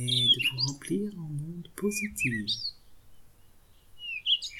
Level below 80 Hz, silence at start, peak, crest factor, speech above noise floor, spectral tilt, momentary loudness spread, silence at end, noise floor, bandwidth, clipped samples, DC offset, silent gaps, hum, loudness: -58 dBFS; 0 s; -12 dBFS; 18 dB; 27 dB; -3 dB/octave; 15 LU; 0 s; -56 dBFS; 17 kHz; under 0.1%; under 0.1%; none; none; -28 LUFS